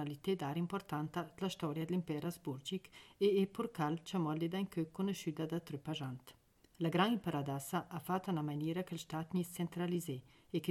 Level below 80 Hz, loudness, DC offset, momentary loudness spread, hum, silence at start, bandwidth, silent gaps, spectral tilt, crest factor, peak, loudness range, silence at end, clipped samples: -74 dBFS; -39 LUFS; under 0.1%; 9 LU; none; 0 s; 16 kHz; none; -6 dB/octave; 18 dB; -20 dBFS; 2 LU; 0 s; under 0.1%